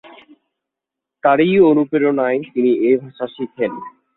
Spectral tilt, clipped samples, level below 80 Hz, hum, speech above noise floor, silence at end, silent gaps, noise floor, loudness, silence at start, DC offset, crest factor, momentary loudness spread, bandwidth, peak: -11.5 dB/octave; under 0.1%; -62 dBFS; none; 68 dB; 0.25 s; none; -84 dBFS; -16 LUFS; 1.25 s; under 0.1%; 16 dB; 14 LU; 4.1 kHz; -2 dBFS